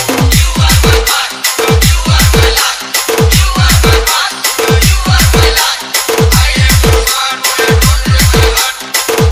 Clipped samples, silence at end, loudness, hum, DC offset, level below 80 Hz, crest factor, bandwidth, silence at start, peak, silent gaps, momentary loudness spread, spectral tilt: 1%; 0 s; -8 LUFS; none; under 0.1%; -14 dBFS; 8 dB; over 20 kHz; 0 s; 0 dBFS; none; 4 LU; -3.5 dB/octave